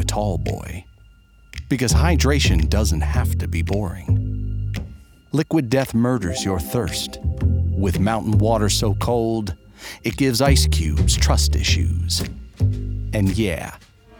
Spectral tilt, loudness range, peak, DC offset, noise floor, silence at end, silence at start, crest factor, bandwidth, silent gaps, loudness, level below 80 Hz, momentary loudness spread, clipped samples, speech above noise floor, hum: -5 dB/octave; 3 LU; -2 dBFS; under 0.1%; -49 dBFS; 0.45 s; 0 s; 18 dB; over 20 kHz; none; -20 LUFS; -26 dBFS; 12 LU; under 0.1%; 30 dB; none